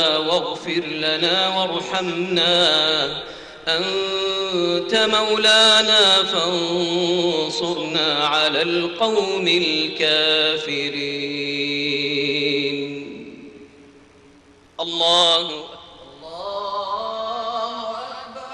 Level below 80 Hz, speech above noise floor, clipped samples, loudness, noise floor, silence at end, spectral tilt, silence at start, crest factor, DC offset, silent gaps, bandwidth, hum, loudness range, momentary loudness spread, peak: -60 dBFS; 31 dB; under 0.1%; -18 LUFS; -50 dBFS; 0 s; -3 dB/octave; 0 s; 16 dB; under 0.1%; none; 11 kHz; none; 8 LU; 15 LU; -6 dBFS